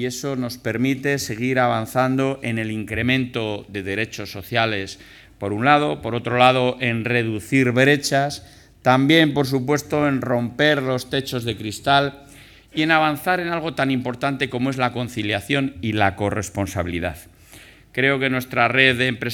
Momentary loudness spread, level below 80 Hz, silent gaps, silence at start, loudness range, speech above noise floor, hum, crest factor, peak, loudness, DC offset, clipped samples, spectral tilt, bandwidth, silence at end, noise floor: 11 LU; -52 dBFS; none; 0 s; 5 LU; 26 dB; none; 20 dB; 0 dBFS; -20 LUFS; under 0.1%; under 0.1%; -5 dB/octave; 18.5 kHz; 0 s; -46 dBFS